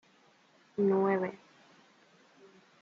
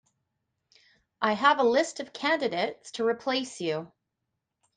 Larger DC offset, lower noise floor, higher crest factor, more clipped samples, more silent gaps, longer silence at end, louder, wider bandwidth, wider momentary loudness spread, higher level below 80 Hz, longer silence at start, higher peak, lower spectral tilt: neither; second, -65 dBFS vs -83 dBFS; about the same, 18 dB vs 22 dB; neither; neither; first, 1.45 s vs 0.9 s; second, -31 LUFS vs -27 LUFS; second, 6.8 kHz vs 9.6 kHz; first, 17 LU vs 10 LU; second, -84 dBFS vs -76 dBFS; second, 0.8 s vs 1.2 s; second, -18 dBFS vs -8 dBFS; first, -9 dB/octave vs -3.5 dB/octave